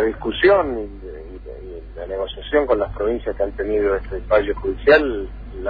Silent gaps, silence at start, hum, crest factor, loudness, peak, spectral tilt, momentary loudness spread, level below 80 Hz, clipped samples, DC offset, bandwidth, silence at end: none; 0 s; none; 16 dB; -20 LUFS; -4 dBFS; -8 dB/octave; 20 LU; -34 dBFS; under 0.1%; under 0.1%; 5 kHz; 0 s